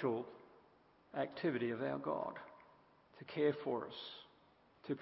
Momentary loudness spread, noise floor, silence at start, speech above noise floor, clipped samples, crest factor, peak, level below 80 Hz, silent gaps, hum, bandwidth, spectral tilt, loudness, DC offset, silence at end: 19 LU; -69 dBFS; 0 s; 29 dB; under 0.1%; 20 dB; -24 dBFS; -82 dBFS; none; none; 5.6 kHz; -4.5 dB/octave; -41 LUFS; under 0.1%; 0 s